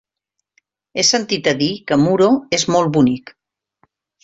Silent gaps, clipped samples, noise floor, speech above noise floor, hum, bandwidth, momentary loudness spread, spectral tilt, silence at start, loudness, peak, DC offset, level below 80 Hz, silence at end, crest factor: none; under 0.1%; -78 dBFS; 62 dB; none; 8.2 kHz; 5 LU; -4 dB/octave; 0.95 s; -16 LUFS; -2 dBFS; under 0.1%; -54 dBFS; 1.05 s; 16 dB